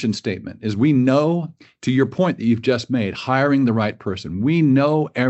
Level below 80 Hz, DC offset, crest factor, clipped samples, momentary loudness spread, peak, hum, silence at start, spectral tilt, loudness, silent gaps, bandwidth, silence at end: -56 dBFS; under 0.1%; 16 dB; under 0.1%; 11 LU; -4 dBFS; none; 0 s; -7.5 dB/octave; -19 LUFS; none; 8.2 kHz; 0 s